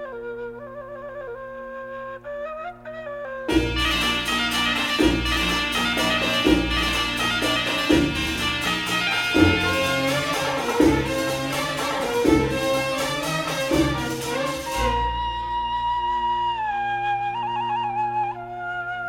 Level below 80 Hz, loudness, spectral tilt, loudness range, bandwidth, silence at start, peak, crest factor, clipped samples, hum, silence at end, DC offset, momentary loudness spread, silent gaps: -38 dBFS; -22 LUFS; -4 dB/octave; 5 LU; 17.5 kHz; 0 s; -4 dBFS; 20 dB; under 0.1%; none; 0 s; under 0.1%; 14 LU; none